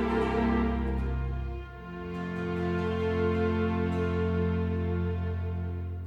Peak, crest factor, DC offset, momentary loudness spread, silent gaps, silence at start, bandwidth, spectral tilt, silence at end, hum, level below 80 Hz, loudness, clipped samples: -16 dBFS; 14 dB; under 0.1%; 9 LU; none; 0 s; 6.8 kHz; -9 dB/octave; 0 s; none; -38 dBFS; -30 LUFS; under 0.1%